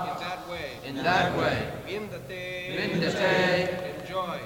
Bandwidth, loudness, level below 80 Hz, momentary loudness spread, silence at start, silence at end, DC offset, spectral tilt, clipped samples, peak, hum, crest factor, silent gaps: 19.5 kHz; -28 LUFS; -54 dBFS; 12 LU; 0 s; 0 s; under 0.1%; -5 dB/octave; under 0.1%; -10 dBFS; none; 18 dB; none